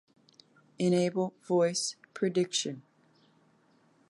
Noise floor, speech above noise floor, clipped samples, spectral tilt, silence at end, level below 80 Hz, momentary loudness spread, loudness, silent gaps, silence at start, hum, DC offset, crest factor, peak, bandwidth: -66 dBFS; 37 dB; under 0.1%; -4.5 dB/octave; 1.3 s; -82 dBFS; 8 LU; -30 LUFS; none; 0.8 s; none; under 0.1%; 16 dB; -16 dBFS; 11.5 kHz